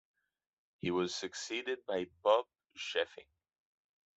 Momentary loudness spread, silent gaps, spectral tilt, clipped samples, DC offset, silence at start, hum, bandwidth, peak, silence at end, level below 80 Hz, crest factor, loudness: 10 LU; none; -3.5 dB/octave; under 0.1%; under 0.1%; 0.85 s; none; 8.2 kHz; -16 dBFS; 0.95 s; -80 dBFS; 22 dB; -36 LUFS